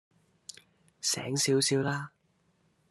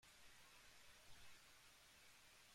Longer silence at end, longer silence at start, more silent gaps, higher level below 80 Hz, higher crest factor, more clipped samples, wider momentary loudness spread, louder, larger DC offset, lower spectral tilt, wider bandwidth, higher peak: first, 0.85 s vs 0 s; first, 1.05 s vs 0 s; neither; first, -74 dBFS vs -80 dBFS; about the same, 18 dB vs 16 dB; neither; first, 22 LU vs 1 LU; first, -29 LUFS vs -66 LUFS; neither; first, -3.5 dB/octave vs -1 dB/octave; second, 13 kHz vs 16 kHz; first, -16 dBFS vs -50 dBFS